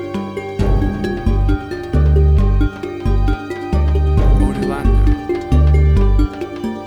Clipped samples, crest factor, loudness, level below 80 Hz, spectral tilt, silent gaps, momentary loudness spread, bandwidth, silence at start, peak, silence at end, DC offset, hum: under 0.1%; 12 dB; -17 LUFS; -16 dBFS; -8.5 dB/octave; none; 9 LU; 9.4 kHz; 0 s; -2 dBFS; 0 s; under 0.1%; none